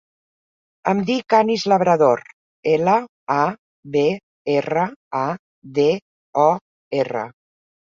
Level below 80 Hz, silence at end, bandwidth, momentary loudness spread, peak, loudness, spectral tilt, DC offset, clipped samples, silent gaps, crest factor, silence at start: -64 dBFS; 0.65 s; 7.6 kHz; 11 LU; -2 dBFS; -20 LUFS; -6 dB/octave; under 0.1%; under 0.1%; 2.33-2.63 s, 3.09-3.27 s, 3.59-3.83 s, 4.23-4.45 s, 4.96-5.11 s, 5.39-5.62 s, 6.02-6.33 s, 6.61-6.91 s; 18 dB; 0.85 s